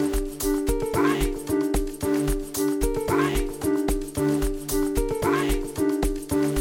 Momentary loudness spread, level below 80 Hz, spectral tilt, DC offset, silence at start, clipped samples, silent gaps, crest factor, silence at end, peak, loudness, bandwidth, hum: 4 LU; -32 dBFS; -5 dB/octave; under 0.1%; 0 s; under 0.1%; none; 14 dB; 0 s; -10 dBFS; -25 LUFS; 18 kHz; none